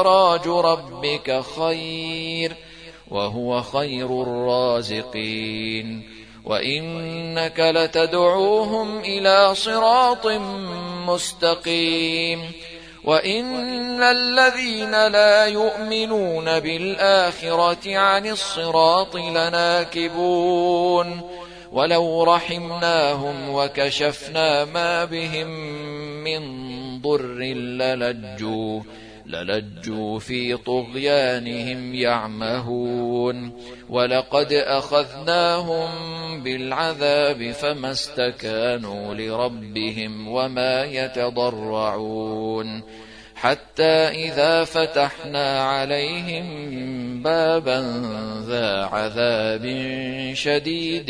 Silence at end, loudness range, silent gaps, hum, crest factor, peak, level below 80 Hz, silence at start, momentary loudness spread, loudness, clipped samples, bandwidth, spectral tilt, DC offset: 0 s; 7 LU; none; none; 20 dB; -2 dBFS; -54 dBFS; 0 s; 12 LU; -21 LUFS; under 0.1%; 11 kHz; -4.5 dB/octave; under 0.1%